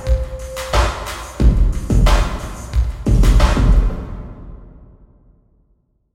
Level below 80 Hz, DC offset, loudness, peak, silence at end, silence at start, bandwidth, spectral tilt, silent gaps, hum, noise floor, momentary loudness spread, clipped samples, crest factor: -18 dBFS; under 0.1%; -18 LUFS; 0 dBFS; 1.3 s; 0 s; 13.5 kHz; -6 dB/octave; none; none; -61 dBFS; 16 LU; under 0.1%; 16 dB